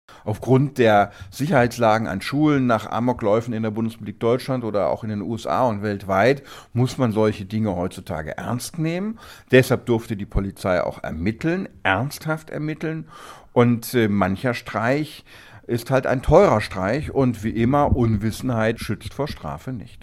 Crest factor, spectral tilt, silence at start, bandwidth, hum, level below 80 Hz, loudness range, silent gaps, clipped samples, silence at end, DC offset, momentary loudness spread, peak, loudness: 20 dB; -6.5 dB/octave; 0.1 s; 15.5 kHz; none; -40 dBFS; 4 LU; none; under 0.1%; 0 s; under 0.1%; 11 LU; 0 dBFS; -22 LUFS